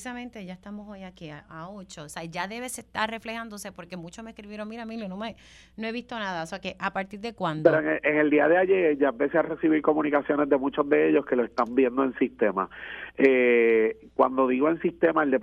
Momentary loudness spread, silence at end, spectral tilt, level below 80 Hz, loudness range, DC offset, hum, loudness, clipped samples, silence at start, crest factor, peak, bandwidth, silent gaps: 20 LU; 0 s; -5.5 dB/octave; -60 dBFS; 12 LU; under 0.1%; none; -25 LUFS; under 0.1%; 0 s; 22 dB; -4 dBFS; 13.5 kHz; none